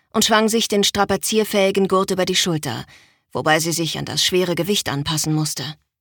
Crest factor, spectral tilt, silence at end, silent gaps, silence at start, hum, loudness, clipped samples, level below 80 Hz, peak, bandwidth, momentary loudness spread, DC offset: 18 dB; -3.5 dB/octave; 0.25 s; none; 0.15 s; none; -19 LUFS; under 0.1%; -52 dBFS; -2 dBFS; 19 kHz; 8 LU; under 0.1%